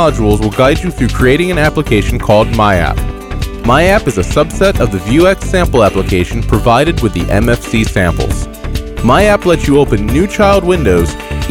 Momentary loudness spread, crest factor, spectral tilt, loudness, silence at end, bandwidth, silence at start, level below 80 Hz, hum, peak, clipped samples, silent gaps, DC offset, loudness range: 8 LU; 10 dB; -6 dB/octave; -11 LUFS; 0 s; 17 kHz; 0 s; -20 dBFS; none; 0 dBFS; under 0.1%; none; 0.3%; 1 LU